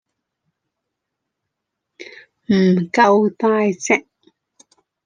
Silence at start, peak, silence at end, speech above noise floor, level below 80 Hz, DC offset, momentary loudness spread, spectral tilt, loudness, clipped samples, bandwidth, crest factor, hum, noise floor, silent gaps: 2 s; -2 dBFS; 1.05 s; 64 dB; -66 dBFS; under 0.1%; 24 LU; -6 dB/octave; -16 LUFS; under 0.1%; 9.6 kHz; 18 dB; none; -79 dBFS; none